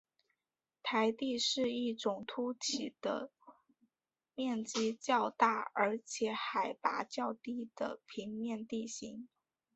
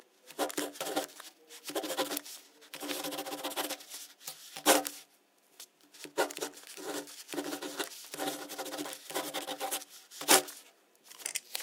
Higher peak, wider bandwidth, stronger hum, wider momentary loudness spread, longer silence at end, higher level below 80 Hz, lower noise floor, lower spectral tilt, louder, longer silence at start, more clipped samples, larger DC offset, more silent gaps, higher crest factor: second, -14 dBFS vs -6 dBFS; second, 8 kHz vs 18 kHz; neither; second, 11 LU vs 22 LU; first, 0.5 s vs 0 s; first, -80 dBFS vs under -90 dBFS; first, under -90 dBFS vs -67 dBFS; first, -2 dB/octave vs -0.5 dB/octave; second, -37 LUFS vs -34 LUFS; first, 0.85 s vs 0.25 s; neither; neither; neither; second, 24 dB vs 30 dB